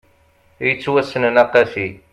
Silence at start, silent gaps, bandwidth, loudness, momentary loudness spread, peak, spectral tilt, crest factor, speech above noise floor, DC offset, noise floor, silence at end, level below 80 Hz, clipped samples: 0.6 s; none; 10.5 kHz; -17 LUFS; 8 LU; 0 dBFS; -6 dB/octave; 18 dB; 38 dB; under 0.1%; -55 dBFS; 0.15 s; -56 dBFS; under 0.1%